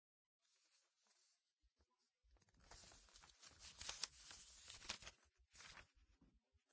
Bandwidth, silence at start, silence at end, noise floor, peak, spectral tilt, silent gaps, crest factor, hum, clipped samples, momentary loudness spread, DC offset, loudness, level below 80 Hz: 8 kHz; 0.5 s; 0.15 s; -86 dBFS; -26 dBFS; 0 dB/octave; none; 36 dB; none; under 0.1%; 14 LU; under 0.1%; -56 LUFS; -76 dBFS